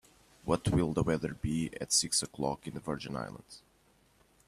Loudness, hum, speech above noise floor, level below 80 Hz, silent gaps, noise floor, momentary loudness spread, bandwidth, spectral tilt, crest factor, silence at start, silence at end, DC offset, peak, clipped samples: -32 LUFS; none; 34 dB; -52 dBFS; none; -67 dBFS; 14 LU; 15 kHz; -4 dB/octave; 20 dB; 0.45 s; 0.9 s; under 0.1%; -14 dBFS; under 0.1%